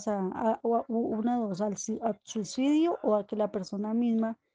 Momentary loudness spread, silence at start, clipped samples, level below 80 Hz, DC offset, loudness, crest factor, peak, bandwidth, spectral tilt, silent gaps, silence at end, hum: 7 LU; 0 s; under 0.1%; -72 dBFS; under 0.1%; -30 LUFS; 14 dB; -14 dBFS; 9.6 kHz; -6 dB/octave; none; 0.2 s; none